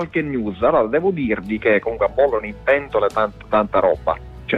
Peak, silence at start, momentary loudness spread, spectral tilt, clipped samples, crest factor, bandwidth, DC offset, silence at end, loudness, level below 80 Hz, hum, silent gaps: -6 dBFS; 0 s; 5 LU; -7.5 dB/octave; under 0.1%; 14 dB; 8 kHz; under 0.1%; 0 s; -19 LUFS; -42 dBFS; none; none